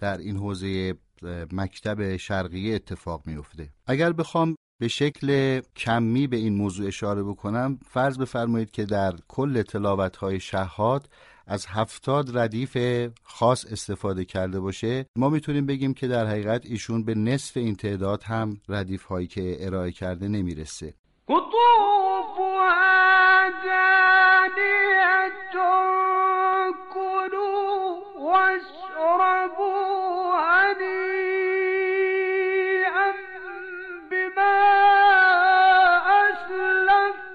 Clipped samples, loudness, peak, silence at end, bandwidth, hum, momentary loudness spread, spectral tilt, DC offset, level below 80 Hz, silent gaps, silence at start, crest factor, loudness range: under 0.1%; -22 LUFS; -8 dBFS; 0 s; 11.5 kHz; none; 15 LU; -5.5 dB/octave; under 0.1%; -54 dBFS; 4.57-4.79 s, 15.08-15.14 s, 20.99-21.04 s; 0 s; 14 dB; 10 LU